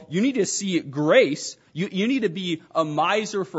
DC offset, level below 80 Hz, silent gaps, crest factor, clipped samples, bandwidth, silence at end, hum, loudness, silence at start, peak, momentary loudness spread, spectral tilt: under 0.1%; -74 dBFS; none; 18 dB; under 0.1%; 8 kHz; 0 s; none; -23 LUFS; 0 s; -4 dBFS; 11 LU; -4.5 dB/octave